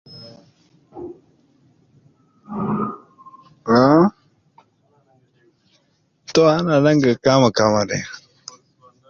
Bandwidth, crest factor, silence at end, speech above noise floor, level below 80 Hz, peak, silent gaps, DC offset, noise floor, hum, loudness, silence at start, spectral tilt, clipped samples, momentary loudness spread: 7.4 kHz; 18 dB; 0.95 s; 48 dB; -56 dBFS; -2 dBFS; none; under 0.1%; -64 dBFS; none; -17 LUFS; 0.15 s; -6 dB/octave; under 0.1%; 25 LU